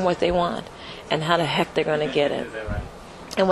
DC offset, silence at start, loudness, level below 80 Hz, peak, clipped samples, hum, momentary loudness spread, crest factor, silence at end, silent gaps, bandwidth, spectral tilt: under 0.1%; 0 s; -24 LUFS; -42 dBFS; -4 dBFS; under 0.1%; none; 16 LU; 20 dB; 0 s; none; 12.5 kHz; -5.5 dB/octave